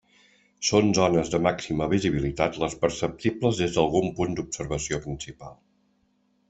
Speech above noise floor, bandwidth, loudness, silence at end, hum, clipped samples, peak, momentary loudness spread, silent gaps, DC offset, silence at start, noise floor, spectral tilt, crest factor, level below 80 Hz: 43 dB; 8.4 kHz; -25 LUFS; 0.95 s; none; under 0.1%; -6 dBFS; 10 LU; none; under 0.1%; 0.6 s; -68 dBFS; -5 dB/octave; 20 dB; -48 dBFS